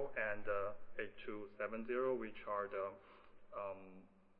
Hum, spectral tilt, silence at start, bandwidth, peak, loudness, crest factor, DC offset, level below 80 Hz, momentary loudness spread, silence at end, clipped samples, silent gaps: none; -4 dB/octave; 0 s; 4.3 kHz; -26 dBFS; -44 LUFS; 18 dB; under 0.1%; -64 dBFS; 16 LU; 0.05 s; under 0.1%; none